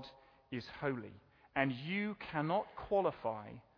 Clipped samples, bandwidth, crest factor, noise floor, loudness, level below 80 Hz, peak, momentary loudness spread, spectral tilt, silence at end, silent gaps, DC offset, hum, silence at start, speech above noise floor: under 0.1%; 5.4 kHz; 22 dB; -58 dBFS; -39 LUFS; -68 dBFS; -18 dBFS; 12 LU; -4.5 dB/octave; 0.15 s; none; under 0.1%; none; 0 s; 20 dB